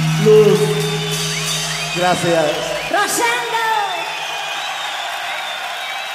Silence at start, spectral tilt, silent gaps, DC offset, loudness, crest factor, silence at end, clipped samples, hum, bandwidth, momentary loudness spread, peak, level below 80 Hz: 0 s; -3.5 dB/octave; none; under 0.1%; -17 LUFS; 16 dB; 0 s; under 0.1%; none; 15.5 kHz; 11 LU; -2 dBFS; -52 dBFS